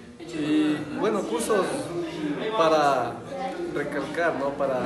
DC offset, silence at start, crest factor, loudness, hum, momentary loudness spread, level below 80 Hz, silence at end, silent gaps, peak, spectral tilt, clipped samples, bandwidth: under 0.1%; 0 s; 16 dB; -26 LUFS; none; 10 LU; -58 dBFS; 0 s; none; -10 dBFS; -5 dB/octave; under 0.1%; 12.5 kHz